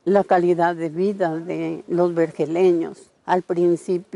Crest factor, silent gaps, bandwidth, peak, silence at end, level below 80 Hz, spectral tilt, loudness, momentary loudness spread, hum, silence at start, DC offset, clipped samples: 16 dB; none; 11 kHz; -4 dBFS; 0.1 s; -68 dBFS; -7.5 dB/octave; -21 LUFS; 9 LU; none; 0.05 s; under 0.1%; under 0.1%